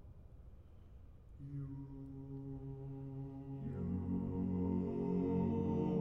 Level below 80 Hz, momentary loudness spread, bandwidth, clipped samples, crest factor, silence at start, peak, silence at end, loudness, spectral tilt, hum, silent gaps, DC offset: -58 dBFS; 23 LU; 3.7 kHz; under 0.1%; 16 dB; 0 s; -26 dBFS; 0 s; -41 LUFS; -11.5 dB/octave; none; none; under 0.1%